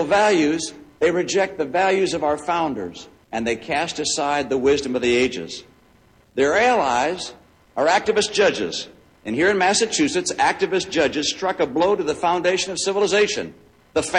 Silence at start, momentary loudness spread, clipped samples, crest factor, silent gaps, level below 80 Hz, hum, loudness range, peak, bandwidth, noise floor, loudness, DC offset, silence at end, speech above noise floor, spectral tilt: 0 s; 13 LU; under 0.1%; 16 dB; none; -54 dBFS; none; 2 LU; -4 dBFS; 11 kHz; -55 dBFS; -20 LUFS; under 0.1%; 0 s; 35 dB; -3 dB/octave